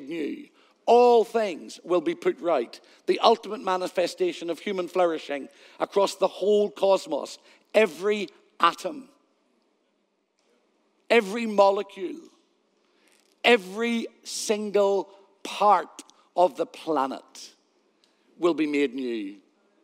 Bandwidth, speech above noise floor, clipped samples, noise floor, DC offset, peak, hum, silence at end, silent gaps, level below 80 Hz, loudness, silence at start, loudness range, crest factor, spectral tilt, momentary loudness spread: 15.5 kHz; 48 dB; under 0.1%; -72 dBFS; under 0.1%; -4 dBFS; none; 0.5 s; none; under -90 dBFS; -25 LUFS; 0 s; 4 LU; 22 dB; -4 dB/octave; 16 LU